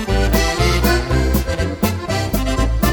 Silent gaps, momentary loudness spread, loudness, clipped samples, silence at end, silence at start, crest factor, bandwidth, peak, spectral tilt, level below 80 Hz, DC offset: none; 4 LU; -18 LUFS; under 0.1%; 0 s; 0 s; 14 dB; over 20 kHz; -2 dBFS; -5 dB/octave; -20 dBFS; under 0.1%